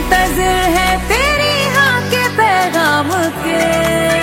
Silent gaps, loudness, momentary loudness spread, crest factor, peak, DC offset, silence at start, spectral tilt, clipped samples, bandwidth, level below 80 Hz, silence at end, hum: none; -13 LUFS; 3 LU; 14 dB; 0 dBFS; under 0.1%; 0 s; -3.5 dB/octave; under 0.1%; 16.5 kHz; -28 dBFS; 0 s; none